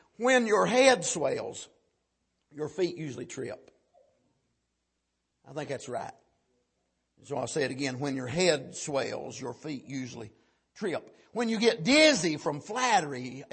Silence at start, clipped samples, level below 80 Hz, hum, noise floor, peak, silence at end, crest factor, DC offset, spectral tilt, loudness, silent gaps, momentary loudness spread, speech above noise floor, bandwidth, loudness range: 0.2 s; under 0.1%; -70 dBFS; none; -81 dBFS; -6 dBFS; 0.1 s; 24 dB; under 0.1%; -3.5 dB/octave; -28 LUFS; none; 18 LU; 52 dB; 8.8 kHz; 15 LU